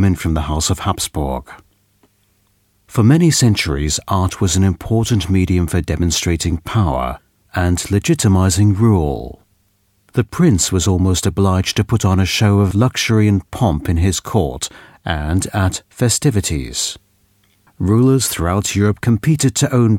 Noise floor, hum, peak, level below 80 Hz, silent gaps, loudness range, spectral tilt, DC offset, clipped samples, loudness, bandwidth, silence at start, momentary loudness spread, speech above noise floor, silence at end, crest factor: -60 dBFS; none; 0 dBFS; -32 dBFS; none; 3 LU; -5 dB/octave; under 0.1%; under 0.1%; -16 LUFS; 16.5 kHz; 0 s; 9 LU; 45 dB; 0 s; 16 dB